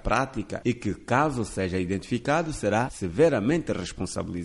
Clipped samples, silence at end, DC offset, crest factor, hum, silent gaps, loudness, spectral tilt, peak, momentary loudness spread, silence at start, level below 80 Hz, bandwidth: under 0.1%; 0 s; under 0.1%; 18 dB; none; none; -27 LUFS; -6 dB/octave; -8 dBFS; 9 LU; 0.05 s; -44 dBFS; 11.5 kHz